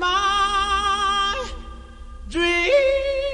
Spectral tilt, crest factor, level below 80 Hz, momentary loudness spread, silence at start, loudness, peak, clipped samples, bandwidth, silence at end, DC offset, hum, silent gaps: -3 dB/octave; 14 dB; -36 dBFS; 14 LU; 0 s; -20 LUFS; -8 dBFS; under 0.1%; 10.5 kHz; 0 s; under 0.1%; none; none